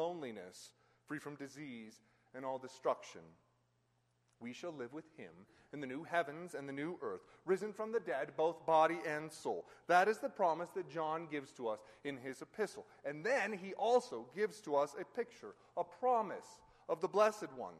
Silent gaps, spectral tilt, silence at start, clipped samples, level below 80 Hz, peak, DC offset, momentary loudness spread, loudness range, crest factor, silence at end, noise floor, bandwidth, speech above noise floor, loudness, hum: none; -4.5 dB/octave; 0 s; under 0.1%; -84 dBFS; -18 dBFS; under 0.1%; 18 LU; 11 LU; 22 dB; 0 s; -79 dBFS; 13 kHz; 39 dB; -39 LUFS; none